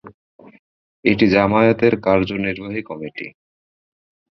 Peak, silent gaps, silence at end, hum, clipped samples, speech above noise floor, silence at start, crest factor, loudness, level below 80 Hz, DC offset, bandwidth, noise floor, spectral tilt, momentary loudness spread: -2 dBFS; 0.14-0.39 s, 0.59-1.03 s; 1.05 s; none; under 0.1%; over 73 dB; 0.05 s; 18 dB; -17 LUFS; -48 dBFS; under 0.1%; 6.2 kHz; under -90 dBFS; -8 dB/octave; 16 LU